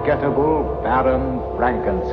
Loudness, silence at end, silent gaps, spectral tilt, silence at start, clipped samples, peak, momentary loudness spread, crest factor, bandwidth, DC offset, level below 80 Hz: -19 LUFS; 0 s; none; -10 dB/octave; 0 s; under 0.1%; -6 dBFS; 4 LU; 12 dB; 5.6 kHz; under 0.1%; -32 dBFS